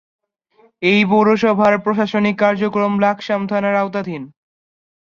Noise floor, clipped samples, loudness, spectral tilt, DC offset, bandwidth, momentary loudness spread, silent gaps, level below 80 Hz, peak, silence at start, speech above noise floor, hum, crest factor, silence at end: -55 dBFS; under 0.1%; -16 LUFS; -7 dB/octave; under 0.1%; 7 kHz; 8 LU; none; -60 dBFS; -2 dBFS; 0.8 s; 39 dB; none; 16 dB; 0.85 s